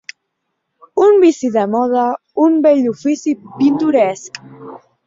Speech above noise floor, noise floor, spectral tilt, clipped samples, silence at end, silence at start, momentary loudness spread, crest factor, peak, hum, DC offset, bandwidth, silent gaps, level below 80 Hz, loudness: 58 dB; -72 dBFS; -5.5 dB/octave; under 0.1%; 0.3 s; 0.95 s; 14 LU; 14 dB; -2 dBFS; none; under 0.1%; 7.8 kHz; none; -62 dBFS; -14 LUFS